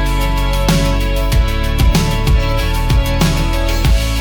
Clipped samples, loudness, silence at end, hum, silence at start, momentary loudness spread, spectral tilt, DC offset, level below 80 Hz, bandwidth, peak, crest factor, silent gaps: under 0.1%; -15 LUFS; 0 s; none; 0 s; 3 LU; -5 dB/octave; under 0.1%; -14 dBFS; 19 kHz; -2 dBFS; 10 dB; none